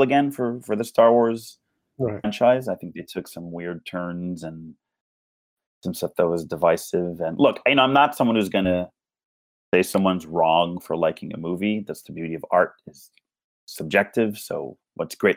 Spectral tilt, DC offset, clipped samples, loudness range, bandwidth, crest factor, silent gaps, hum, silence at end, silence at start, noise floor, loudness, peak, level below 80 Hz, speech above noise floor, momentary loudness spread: -5.5 dB/octave; under 0.1%; under 0.1%; 7 LU; 19 kHz; 20 dB; 5.01-5.57 s, 5.66-5.81 s, 9.25-9.72 s, 13.44-13.67 s; none; 0 s; 0 s; under -90 dBFS; -22 LUFS; -4 dBFS; -66 dBFS; over 68 dB; 16 LU